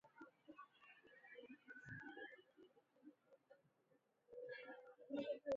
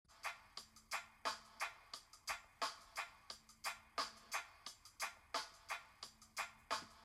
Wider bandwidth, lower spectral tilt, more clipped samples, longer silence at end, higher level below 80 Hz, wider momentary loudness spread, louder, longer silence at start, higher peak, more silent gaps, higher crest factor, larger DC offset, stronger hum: second, 7.2 kHz vs 16 kHz; first, -4 dB/octave vs 0.5 dB/octave; neither; about the same, 0 s vs 0 s; second, -88 dBFS vs -76 dBFS; first, 17 LU vs 11 LU; second, -56 LUFS vs -48 LUFS; about the same, 0.05 s vs 0.1 s; second, -36 dBFS vs -28 dBFS; neither; about the same, 20 dB vs 22 dB; neither; neither